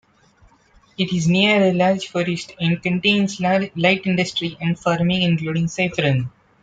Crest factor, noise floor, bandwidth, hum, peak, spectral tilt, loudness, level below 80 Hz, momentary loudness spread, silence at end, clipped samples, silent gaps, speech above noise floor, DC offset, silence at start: 18 dB; -54 dBFS; 9 kHz; none; -2 dBFS; -5.5 dB/octave; -19 LUFS; -54 dBFS; 8 LU; 0.35 s; under 0.1%; none; 35 dB; under 0.1%; 1 s